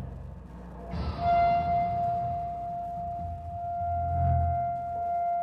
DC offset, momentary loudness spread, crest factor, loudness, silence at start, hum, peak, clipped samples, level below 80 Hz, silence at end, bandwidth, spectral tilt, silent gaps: under 0.1%; 16 LU; 14 dB; -29 LUFS; 0 s; none; -16 dBFS; under 0.1%; -44 dBFS; 0 s; 5.8 kHz; -9 dB/octave; none